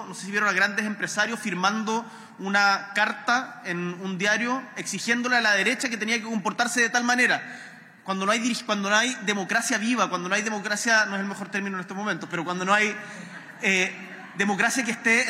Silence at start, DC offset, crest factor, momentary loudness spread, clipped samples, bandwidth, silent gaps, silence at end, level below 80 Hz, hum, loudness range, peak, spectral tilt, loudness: 0 s; under 0.1%; 16 dB; 10 LU; under 0.1%; 16 kHz; none; 0 s; -80 dBFS; none; 2 LU; -10 dBFS; -3 dB/octave; -24 LUFS